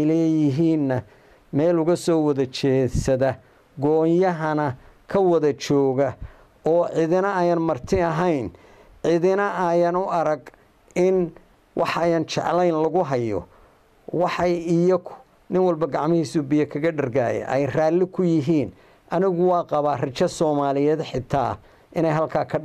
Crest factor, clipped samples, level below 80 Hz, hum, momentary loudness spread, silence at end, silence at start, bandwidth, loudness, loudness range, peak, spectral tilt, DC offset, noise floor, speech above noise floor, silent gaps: 14 dB; under 0.1%; -48 dBFS; none; 8 LU; 0 s; 0 s; 12.5 kHz; -22 LUFS; 2 LU; -8 dBFS; -7 dB/octave; under 0.1%; -54 dBFS; 33 dB; none